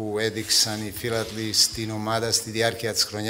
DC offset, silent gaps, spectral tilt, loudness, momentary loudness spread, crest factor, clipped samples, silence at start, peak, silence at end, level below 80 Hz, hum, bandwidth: under 0.1%; none; -2.5 dB/octave; -23 LUFS; 8 LU; 20 dB; under 0.1%; 0 s; -6 dBFS; 0 s; -54 dBFS; none; 16.5 kHz